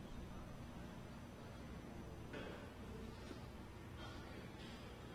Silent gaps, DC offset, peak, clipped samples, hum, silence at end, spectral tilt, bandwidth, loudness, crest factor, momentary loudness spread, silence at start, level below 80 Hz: none; under 0.1%; -38 dBFS; under 0.1%; none; 0 s; -6 dB/octave; 17.5 kHz; -54 LUFS; 14 dB; 3 LU; 0 s; -60 dBFS